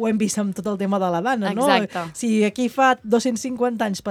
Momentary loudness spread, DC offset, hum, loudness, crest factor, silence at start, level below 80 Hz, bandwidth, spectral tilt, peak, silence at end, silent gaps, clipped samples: 7 LU; under 0.1%; none; -21 LUFS; 20 dB; 0 s; -62 dBFS; 15 kHz; -4.5 dB/octave; 0 dBFS; 0 s; none; under 0.1%